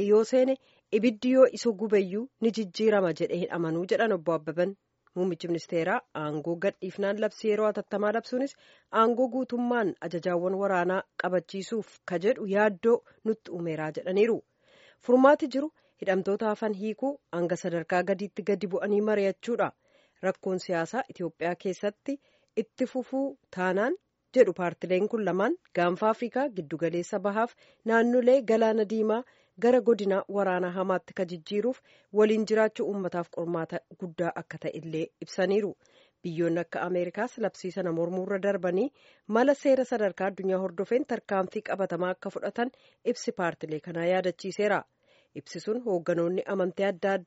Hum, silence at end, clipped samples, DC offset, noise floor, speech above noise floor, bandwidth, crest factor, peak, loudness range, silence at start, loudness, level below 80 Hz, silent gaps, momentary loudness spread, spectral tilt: none; 0.05 s; under 0.1%; under 0.1%; -60 dBFS; 32 dB; 8 kHz; 22 dB; -6 dBFS; 5 LU; 0 s; -28 LUFS; -78 dBFS; none; 10 LU; -5 dB/octave